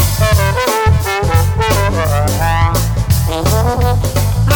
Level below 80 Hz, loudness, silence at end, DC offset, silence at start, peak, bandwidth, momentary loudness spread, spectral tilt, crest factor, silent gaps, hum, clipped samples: -20 dBFS; -13 LUFS; 0 s; under 0.1%; 0 s; 0 dBFS; 19.5 kHz; 2 LU; -5 dB/octave; 12 dB; none; none; under 0.1%